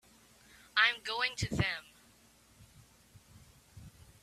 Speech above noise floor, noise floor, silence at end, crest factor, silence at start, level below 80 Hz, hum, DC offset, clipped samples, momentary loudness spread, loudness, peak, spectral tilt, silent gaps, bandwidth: 31 dB; -64 dBFS; 0.35 s; 26 dB; 0.75 s; -60 dBFS; none; under 0.1%; under 0.1%; 27 LU; -32 LUFS; -12 dBFS; -3.5 dB/octave; none; 15 kHz